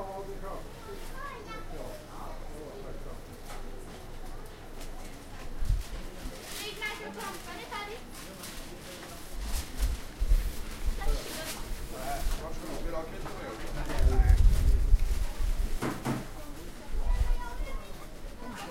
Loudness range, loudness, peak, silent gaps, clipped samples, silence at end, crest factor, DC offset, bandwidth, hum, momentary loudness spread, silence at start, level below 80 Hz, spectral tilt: 13 LU; -36 LUFS; -10 dBFS; none; under 0.1%; 0 s; 20 dB; under 0.1%; 16 kHz; none; 16 LU; 0 s; -32 dBFS; -5 dB/octave